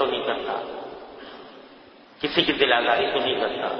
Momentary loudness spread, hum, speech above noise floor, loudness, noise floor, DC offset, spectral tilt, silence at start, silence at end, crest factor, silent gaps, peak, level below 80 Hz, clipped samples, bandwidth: 22 LU; none; 26 dB; -23 LUFS; -49 dBFS; under 0.1%; -5.5 dB/octave; 0 s; 0 s; 22 dB; none; -4 dBFS; -58 dBFS; under 0.1%; 6.2 kHz